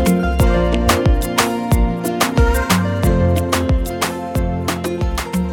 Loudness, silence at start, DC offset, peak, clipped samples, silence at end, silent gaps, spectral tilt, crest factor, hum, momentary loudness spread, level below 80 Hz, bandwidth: -17 LUFS; 0 s; under 0.1%; -2 dBFS; under 0.1%; 0 s; none; -5.5 dB/octave; 14 dB; none; 6 LU; -20 dBFS; 18.5 kHz